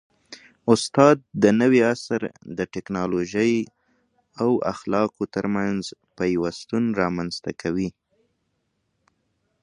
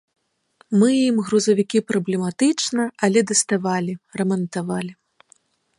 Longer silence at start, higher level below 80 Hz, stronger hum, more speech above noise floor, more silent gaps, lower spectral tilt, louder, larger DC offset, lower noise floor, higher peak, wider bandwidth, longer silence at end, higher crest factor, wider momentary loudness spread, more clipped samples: second, 0.3 s vs 0.7 s; first, -56 dBFS vs -68 dBFS; neither; first, 51 dB vs 39 dB; neither; first, -6 dB/octave vs -4.5 dB/octave; second, -23 LUFS vs -20 LUFS; neither; first, -73 dBFS vs -59 dBFS; first, 0 dBFS vs -4 dBFS; about the same, 11 kHz vs 11.5 kHz; first, 1.75 s vs 0.85 s; about the same, 22 dB vs 18 dB; first, 13 LU vs 9 LU; neither